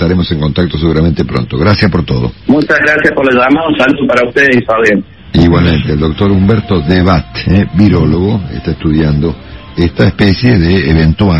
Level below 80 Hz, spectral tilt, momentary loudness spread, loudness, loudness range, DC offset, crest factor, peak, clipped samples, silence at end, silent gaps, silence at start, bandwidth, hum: -24 dBFS; -8 dB/octave; 7 LU; -10 LUFS; 2 LU; 0.7%; 10 dB; 0 dBFS; 0.1%; 0 s; none; 0 s; 8.2 kHz; none